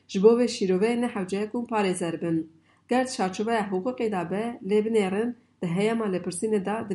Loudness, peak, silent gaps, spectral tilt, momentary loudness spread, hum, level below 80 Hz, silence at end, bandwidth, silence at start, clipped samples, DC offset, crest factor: -26 LUFS; -6 dBFS; none; -5.5 dB/octave; 7 LU; none; -72 dBFS; 0 s; 11.5 kHz; 0.1 s; under 0.1%; under 0.1%; 20 dB